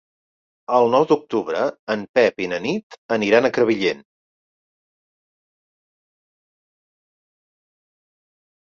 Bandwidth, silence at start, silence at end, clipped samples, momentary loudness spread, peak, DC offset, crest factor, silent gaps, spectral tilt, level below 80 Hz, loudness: 7.2 kHz; 0.7 s; 4.75 s; under 0.1%; 10 LU; -2 dBFS; under 0.1%; 22 dB; 1.79-1.87 s, 2.09-2.14 s, 2.83-2.90 s, 2.98-3.09 s; -5.5 dB/octave; -66 dBFS; -20 LUFS